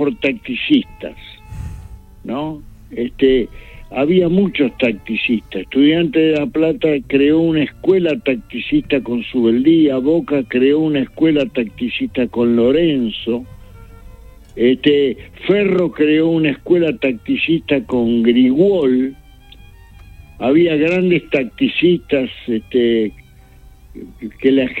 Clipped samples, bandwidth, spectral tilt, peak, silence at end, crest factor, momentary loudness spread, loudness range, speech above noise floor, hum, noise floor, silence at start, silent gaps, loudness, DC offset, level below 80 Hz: under 0.1%; 4.5 kHz; -8 dB/octave; 0 dBFS; 0 s; 14 dB; 12 LU; 3 LU; 27 dB; none; -43 dBFS; 0 s; none; -16 LUFS; under 0.1%; -42 dBFS